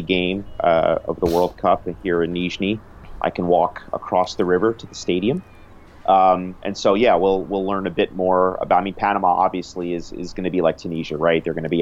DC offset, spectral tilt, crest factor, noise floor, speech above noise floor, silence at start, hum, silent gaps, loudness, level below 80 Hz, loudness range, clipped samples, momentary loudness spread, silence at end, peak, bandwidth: under 0.1%; -6 dB/octave; 16 dB; -43 dBFS; 24 dB; 0 s; none; none; -20 LUFS; -44 dBFS; 3 LU; under 0.1%; 11 LU; 0 s; -4 dBFS; 16 kHz